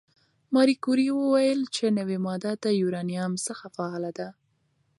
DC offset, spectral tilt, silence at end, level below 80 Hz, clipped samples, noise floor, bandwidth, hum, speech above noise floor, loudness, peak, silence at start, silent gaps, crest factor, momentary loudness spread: under 0.1%; -5.5 dB/octave; 0.7 s; -76 dBFS; under 0.1%; -70 dBFS; 11.5 kHz; none; 45 dB; -26 LUFS; -10 dBFS; 0.5 s; none; 18 dB; 11 LU